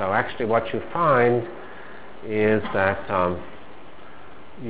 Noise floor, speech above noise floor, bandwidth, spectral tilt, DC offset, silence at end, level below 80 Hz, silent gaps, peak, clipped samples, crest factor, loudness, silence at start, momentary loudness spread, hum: -45 dBFS; 23 dB; 4 kHz; -10 dB/octave; 2%; 0 s; -50 dBFS; none; -6 dBFS; under 0.1%; 18 dB; -22 LUFS; 0 s; 22 LU; none